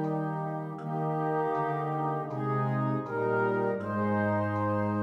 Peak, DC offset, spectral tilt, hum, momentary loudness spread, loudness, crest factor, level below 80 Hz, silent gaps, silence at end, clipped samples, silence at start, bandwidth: -16 dBFS; under 0.1%; -10 dB/octave; none; 5 LU; -30 LUFS; 12 dB; -70 dBFS; none; 0 s; under 0.1%; 0 s; 6.2 kHz